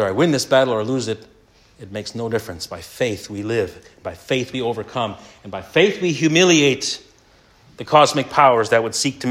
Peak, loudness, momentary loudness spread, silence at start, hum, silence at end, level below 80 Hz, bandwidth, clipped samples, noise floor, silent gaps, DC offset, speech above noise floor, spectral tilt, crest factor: 0 dBFS; -18 LUFS; 17 LU; 0 s; none; 0 s; -58 dBFS; 16 kHz; under 0.1%; -53 dBFS; none; under 0.1%; 34 dB; -4 dB/octave; 18 dB